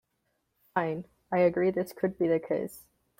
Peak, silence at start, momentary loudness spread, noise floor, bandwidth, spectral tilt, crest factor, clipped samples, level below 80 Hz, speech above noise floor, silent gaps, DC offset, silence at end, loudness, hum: -12 dBFS; 0.75 s; 9 LU; -78 dBFS; 16.5 kHz; -7.5 dB/octave; 20 dB; under 0.1%; -68 dBFS; 49 dB; none; under 0.1%; 0.4 s; -29 LUFS; none